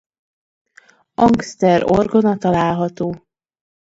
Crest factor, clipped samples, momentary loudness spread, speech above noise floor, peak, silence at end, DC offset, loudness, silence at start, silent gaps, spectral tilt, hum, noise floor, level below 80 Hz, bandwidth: 18 dB; under 0.1%; 11 LU; 36 dB; 0 dBFS; 0.7 s; under 0.1%; -16 LUFS; 1.2 s; none; -7 dB/octave; none; -51 dBFS; -46 dBFS; 8 kHz